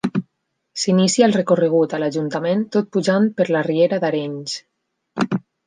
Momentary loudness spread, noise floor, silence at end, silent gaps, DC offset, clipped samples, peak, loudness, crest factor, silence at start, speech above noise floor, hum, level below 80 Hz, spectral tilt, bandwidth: 12 LU; -73 dBFS; 0.3 s; none; under 0.1%; under 0.1%; -2 dBFS; -19 LUFS; 18 dB; 0.05 s; 55 dB; none; -66 dBFS; -5.5 dB/octave; 9.8 kHz